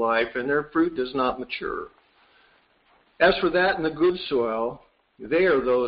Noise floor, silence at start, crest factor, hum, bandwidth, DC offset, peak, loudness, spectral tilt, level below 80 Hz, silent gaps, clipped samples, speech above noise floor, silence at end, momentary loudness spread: -62 dBFS; 0 s; 16 dB; none; 5.4 kHz; under 0.1%; -8 dBFS; -24 LUFS; -2.5 dB/octave; -54 dBFS; none; under 0.1%; 39 dB; 0 s; 11 LU